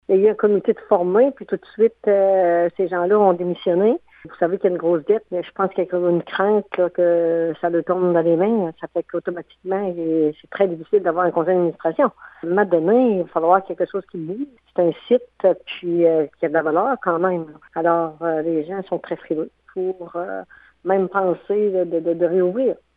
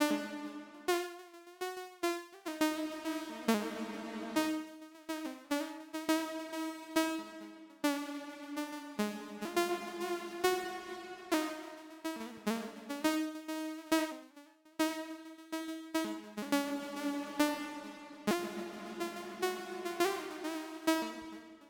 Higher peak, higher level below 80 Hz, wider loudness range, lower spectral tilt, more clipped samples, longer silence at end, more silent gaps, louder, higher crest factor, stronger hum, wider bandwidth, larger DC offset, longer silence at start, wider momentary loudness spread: first, -2 dBFS vs -18 dBFS; first, -66 dBFS vs -78 dBFS; first, 5 LU vs 1 LU; first, -10 dB/octave vs -3.5 dB/octave; neither; first, 0.25 s vs 0 s; neither; first, -20 LUFS vs -37 LUFS; about the same, 18 dB vs 20 dB; neither; second, 4 kHz vs 20 kHz; neither; about the same, 0.1 s vs 0 s; about the same, 10 LU vs 11 LU